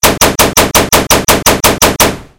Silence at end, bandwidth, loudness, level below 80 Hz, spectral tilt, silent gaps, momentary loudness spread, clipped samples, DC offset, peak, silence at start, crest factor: 0.15 s; over 20 kHz; -8 LUFS; -26 dBFS; -2 dB/octave; none; 1 LU; 3%; 0.8%; 0 dBFS; 0.05 s; 10 dB